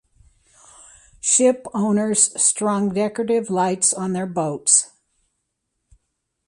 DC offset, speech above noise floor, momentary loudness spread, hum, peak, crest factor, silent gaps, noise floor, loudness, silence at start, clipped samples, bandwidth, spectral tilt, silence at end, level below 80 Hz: under 0.1%; 56 dB; 8 LU; none; -2 dBFS; 20 dB; none; -76 dBFS; -18 LUFS; 1.25 s; under 0.1%; 11.5 kHz; -3.5 dB/octave; 1.6 s; -62 dBFS